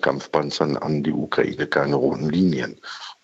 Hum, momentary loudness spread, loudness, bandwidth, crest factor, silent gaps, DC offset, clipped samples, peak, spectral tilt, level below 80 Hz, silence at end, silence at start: none; 8 LU; -22 LUFS; 8 kHz; 18 dB; none; under 0.1%; under 0.1%; -4 dBFS; -6.5 dB/octave; -58 dBFS; 0.1 s; 0 s